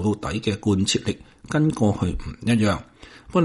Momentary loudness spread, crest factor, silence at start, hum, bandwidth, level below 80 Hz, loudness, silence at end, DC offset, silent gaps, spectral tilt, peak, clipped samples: 9 LU; 16 dB; 0 s; none; 11.5 kHz; -40 dBFS; -23 LUFS; 0 s; under 0.1%; none; -5.5 dB/octave; -8 dBFS; under 0.1%